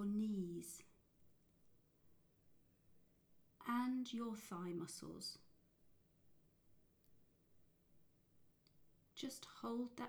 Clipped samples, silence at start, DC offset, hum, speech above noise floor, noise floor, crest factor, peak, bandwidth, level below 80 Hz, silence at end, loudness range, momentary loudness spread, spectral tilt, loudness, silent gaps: under 0.1%; 0 s; under 0.1%; none; 26 dB; -74 dBFS; 18 dB; -32 dBFS; over 20 kHz; -80 dBFS; 0 s; 12 LU; 12 LU; -5 dB/octave; -47 LUFS; none